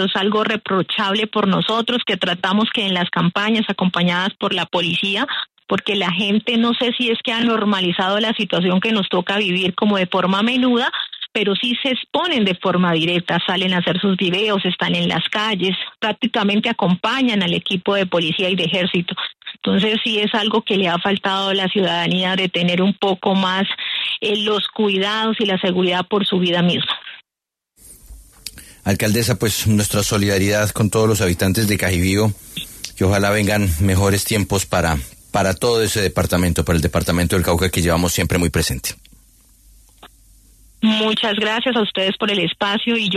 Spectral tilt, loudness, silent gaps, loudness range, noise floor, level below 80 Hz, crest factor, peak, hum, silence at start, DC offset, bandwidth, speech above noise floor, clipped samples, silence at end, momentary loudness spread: -4.5 dB/octave; -18 LUFS; none; 3 LU; -85 dBFS; -40 dBFS; 16 dB; -4 dBFS; none; 0 s; under 0.1%; 13.5 kHz; 67 dB; under 0.1%; 0 s; 4 LU